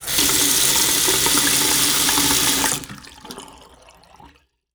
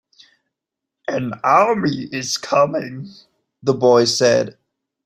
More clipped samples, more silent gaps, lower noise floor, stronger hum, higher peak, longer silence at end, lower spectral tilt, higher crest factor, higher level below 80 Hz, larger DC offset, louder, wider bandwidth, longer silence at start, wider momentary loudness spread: neither; neither; second, -52 dBFS vs -83 dBFS; neither; about the same, 0 dBFS vs -2 dBFS; about the same, 0.5 s vs 0.55 s; second, -0.5 dB/octave vs -4 dB/octave; about the same, 20 dB vs 18 dB; first, -44 dBFS vs -60 dBFS; neither; about the same, -15 LUFS vs -17 LUFS; first, over 20 kHz vs 15.5 kHz; second, 0 s vs 1.1 s; first, 22 LU vs 16 LU